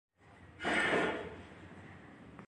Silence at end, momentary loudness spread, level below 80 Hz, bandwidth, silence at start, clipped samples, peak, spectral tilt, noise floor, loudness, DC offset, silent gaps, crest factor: 0 s; 23 LU; -62 dBFS; 11.5 kHz; 0.25 s; under 0.1%; -20 dBFS; -4 dB/octave; -58 dBFS; -34 LUFS; under 0.1%; none; 20 dB